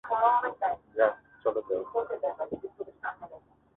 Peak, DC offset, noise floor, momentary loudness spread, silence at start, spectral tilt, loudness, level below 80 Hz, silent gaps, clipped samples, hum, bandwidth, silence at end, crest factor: -10 dBFS; under 0.1%; -53 dBFS; 14 LU; 0.05 s; -8 dB/octave; -30 LUFS; -68 dBFS; none; under 0.1%; none; 4 kHz; 0.4 s; 20 dB